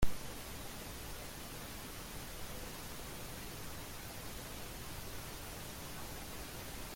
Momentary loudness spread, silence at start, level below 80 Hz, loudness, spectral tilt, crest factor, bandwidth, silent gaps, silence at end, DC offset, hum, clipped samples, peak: 1 LU; 0 s; -50 dBFS; -46 LUFS; -3.5 dB/octave; 22 dB; 16.5 kHz; none; 0 s; under 0.1%; none; under 0.1%; -18 dBFS